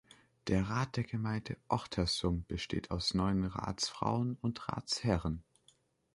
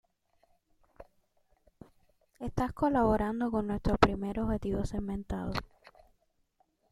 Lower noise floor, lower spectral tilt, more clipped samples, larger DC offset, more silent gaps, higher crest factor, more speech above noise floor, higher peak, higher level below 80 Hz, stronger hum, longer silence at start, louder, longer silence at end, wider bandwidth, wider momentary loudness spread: second, -70 dBFS vs -74 dBFS; second, -5.5 dB/octave vs -7 dB/octave; neither; neither; neither; about the same, 22 dB vs 26 dB; second, 35 dB vs 43 dB; second, -14 dBFS vs -6 dBFS; second, -50 dBFS vs -44 dBFS; neither; second, 0.45 s vs 1 s; second, -36 LUFS vs -32 LUFS; second, 0.75 s vs 1.25 s; second, 11.5 kHz vs 13.5 kHz; second, 6 LU vs 10 LU